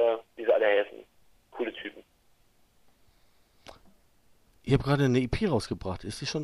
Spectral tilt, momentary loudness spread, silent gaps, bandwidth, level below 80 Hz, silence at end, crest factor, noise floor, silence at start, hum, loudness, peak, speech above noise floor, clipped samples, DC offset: -6.5 dB/octave; 18 LU; none; 12.5 kHz; -50 dBFS; 0 s; 20 dB; -65 dBFS; 0 s; none; -28 LUFS; -10 dBFS; 38 dB; under 0.1%; under 0.1%